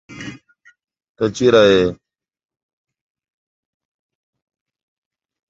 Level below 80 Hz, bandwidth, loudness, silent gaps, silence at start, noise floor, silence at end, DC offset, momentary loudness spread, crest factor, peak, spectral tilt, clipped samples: -52 dBFS; 7.8 kHz; -15 LUFS; 1.09-1.15 s; 0.1 s; -50 dBFS; 3.55 s; under 0.1%; 22 LU; 20 dB; 0 dBFS; -5 dB/octave; under 0.1%